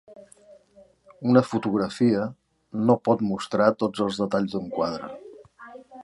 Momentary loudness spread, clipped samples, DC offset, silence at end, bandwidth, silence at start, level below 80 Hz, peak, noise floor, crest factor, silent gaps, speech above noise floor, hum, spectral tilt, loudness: 17 LU; under 0.1%; under 0.1%; 0 s; 11.5 kHz; 0.1 s; -62 dBFS; -4 dBFS; -56 dBFS; 22 dB; none; 33 dB; none; -7 dB/octave; -24 LUFS